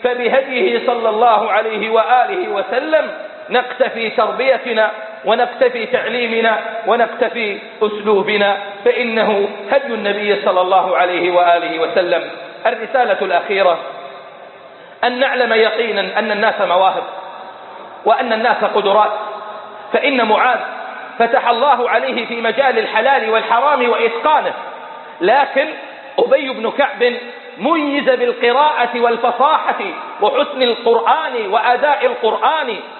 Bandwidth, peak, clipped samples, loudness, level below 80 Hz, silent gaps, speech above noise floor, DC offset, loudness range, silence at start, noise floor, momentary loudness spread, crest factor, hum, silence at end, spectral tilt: 4.4 kHz; 0 dBFS; under 0.1%; -15 LUFS; -68 dBFS; none; 23 dB; under 0.1%; 2 LU; 0 s; -38 dBFS; 10 LU; 16 dB; none; 0 s; -9 dB/octave